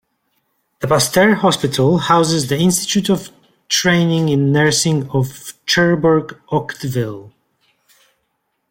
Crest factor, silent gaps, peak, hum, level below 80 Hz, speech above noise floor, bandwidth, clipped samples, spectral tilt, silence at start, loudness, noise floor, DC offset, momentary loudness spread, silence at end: 16 dB; none; -2 dBFS; none; -52 dBFS; 54 dB; 16.5 kHz; under 0.1%; -4.5 dB/octave; 0.8 s; -15 LUFS; -70 dBFS; under 0.1%; 9 LU; 1.45 s